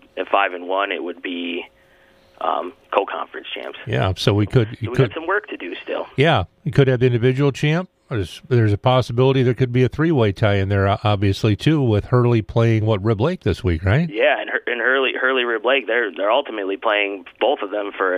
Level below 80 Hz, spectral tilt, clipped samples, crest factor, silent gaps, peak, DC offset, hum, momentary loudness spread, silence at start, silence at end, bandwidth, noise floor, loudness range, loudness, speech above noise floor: -44 dBFS; -7 dB/octave; under 0.1%; 18 dB; none; 0 dBFS; under 0.1%; none; 10 LU; 0.15 s; 0 s; 11 kHz; -53 dBFS; 5 LU; -19 LUFS; 34 dB